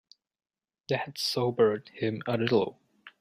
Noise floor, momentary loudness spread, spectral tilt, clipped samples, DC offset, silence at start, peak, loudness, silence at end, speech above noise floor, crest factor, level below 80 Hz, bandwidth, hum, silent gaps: under -90 dBFS; 8 LU; -5.5 dB/octave; under 0.1%; under 0.1%; 0.9 s; -10 dBFS; -29 LUFS; 0.1 s; over 62 dB; 20 dB; -70 dBFS; 15.5 kHz; none; none